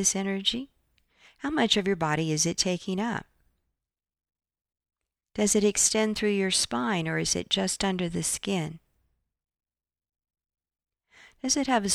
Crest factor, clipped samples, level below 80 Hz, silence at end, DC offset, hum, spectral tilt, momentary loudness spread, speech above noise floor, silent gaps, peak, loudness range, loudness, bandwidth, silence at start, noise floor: 20 dB; under 0.1%; -58 dBFS; 0 s; under 0.1%; none; -3 dB/octave; 10 LU; 62 dB; none; -8 dBFS; 8 LU; -26 LUFS; 14.5 kHz; 0 s; -88 dBFS